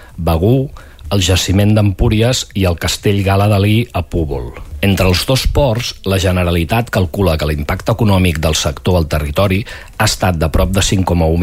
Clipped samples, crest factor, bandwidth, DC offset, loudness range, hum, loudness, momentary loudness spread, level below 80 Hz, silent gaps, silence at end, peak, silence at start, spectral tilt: under 0.1%; 12 dB; 16.5 kHz; under 0.1%; 1 LU; none; -14 LUFS; 6 LU; -24 dBFS; none; 0 s; -2 dBFS; 0 s; -5.5 dB/octave